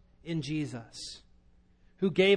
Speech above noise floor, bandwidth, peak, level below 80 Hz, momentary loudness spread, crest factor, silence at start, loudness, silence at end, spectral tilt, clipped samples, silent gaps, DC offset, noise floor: 33 dB; 10 kHz; -12 dBFS; -60 dBFS; 13 LU; 20 dB; 0.25 s; -34 LUFS; 0 s; -5.5 dB/octave; under 0.1%; none; under 0.1%; -62 dBFS